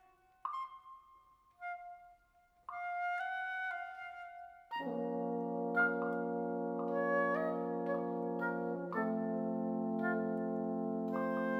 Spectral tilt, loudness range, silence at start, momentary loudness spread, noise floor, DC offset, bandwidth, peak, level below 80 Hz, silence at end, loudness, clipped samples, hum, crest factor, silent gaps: -8.5 dB/octave; 7 LU; 0.45 s; 15 LU; -70 dBFS; under 0.1%; 6 kHz; -20 dBFS; -80 dBFS; 0 s; -38 LUFS; under 0.1%; none; 18 dB; none